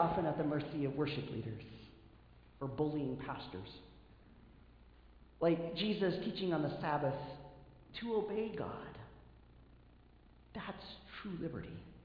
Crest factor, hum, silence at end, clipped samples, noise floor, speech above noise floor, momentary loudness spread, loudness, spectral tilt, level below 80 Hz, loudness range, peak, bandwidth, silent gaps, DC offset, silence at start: 22 dB; none; 0 s; under 0.1%; -63 dBFS; 24 dB; 18 LU; -39 LUFS; -5.5 dB/octave; -62 dBFS; 7 LU; -20 dBFS; 5.2 kHz; none; under 0.1%; 0 s